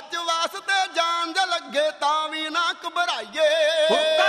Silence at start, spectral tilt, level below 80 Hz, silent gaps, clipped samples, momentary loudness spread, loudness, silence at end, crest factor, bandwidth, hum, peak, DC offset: 0 s; -0.5 dB/octave; -76 dBFS; none; under 0.1%; 6 LU; -22 LUFS; 0 s; 16 dB; 14.5 kHz; none; -6 dBFS; under 0.1%